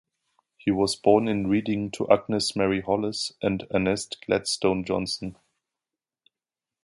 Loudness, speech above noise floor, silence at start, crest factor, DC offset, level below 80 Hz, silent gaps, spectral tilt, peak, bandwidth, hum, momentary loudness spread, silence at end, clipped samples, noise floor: -25 LUFS; over 65 dB; 0.65 s; 22 dB; under 0.1%; -54 dBFS; none; -5 dB/octave; -4 dBFS; 11.5 kHz; none; 8 LU; 1.5 s; under 0.1%; under -90 dBFS